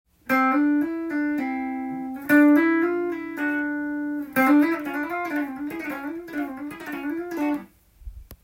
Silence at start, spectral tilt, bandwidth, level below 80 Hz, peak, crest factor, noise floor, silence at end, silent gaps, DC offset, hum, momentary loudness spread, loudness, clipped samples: 0.25 s; -5.5 dB/octave; 16.5 kHz; -54 dBFS; -6 dBFS; 18 dB; -44 dBFS; 0.1 s; none; under 0.1%; none; 13 LU; -24 LUFS; under 0.1%